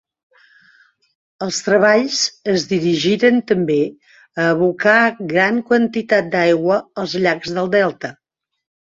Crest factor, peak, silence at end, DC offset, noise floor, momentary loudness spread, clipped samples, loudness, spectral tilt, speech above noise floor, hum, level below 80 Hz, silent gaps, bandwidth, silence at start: 16 dB; -2 dBFS; 0.8 s; under 0.1%; -54 dBFS; 9 LU; under 0.1%; -16 LUFS; -4.5 dB/octave; 38 dB; none; -60 dBFS; none; 8 kHz; 1.4 s